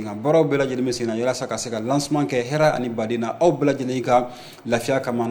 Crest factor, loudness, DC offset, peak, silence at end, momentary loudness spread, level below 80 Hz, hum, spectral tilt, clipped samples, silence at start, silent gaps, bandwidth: 16 dB; -22 LUFS; under 0.1%; -6 dBFS; 0 s; 7 LU; -56 dBFS; none; -5.5 dB/octave; under 0.1%; 0 s; none; 19 kHz